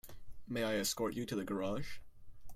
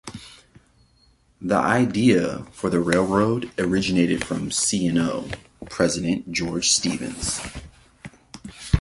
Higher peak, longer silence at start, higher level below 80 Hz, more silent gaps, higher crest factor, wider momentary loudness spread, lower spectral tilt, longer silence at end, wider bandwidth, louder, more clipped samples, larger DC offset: second, -24 dBFS vs -4 dBFS; about the same, 0.05 s vs 0.05 s; second, -58 dBFS vs -40 dBFS; neither; about the same, 16 dB vs 20 dB; about the same, 16 LU vs 17 LU; about the same, -4 dB/octave vs -4 dB/octave; about the same, 0 s vs 0 s; first, 16.5 kHz vs 11.5 kHz; second, -38 LUFS vs -22 LUFS; neither; neither